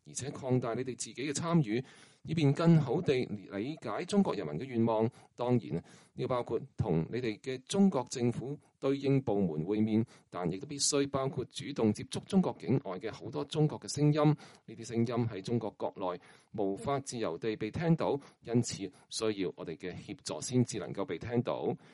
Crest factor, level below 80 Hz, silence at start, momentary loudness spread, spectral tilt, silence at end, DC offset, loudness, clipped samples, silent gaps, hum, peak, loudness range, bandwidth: 18 dB; -66 dBFS; 0.05 s; 11 LU; -6 dB/octave; 0.15 s; under 0.1%; -33 LUFS; under 0.1%; none; none; -14 dBFS; 4 LU; 11.5 kHz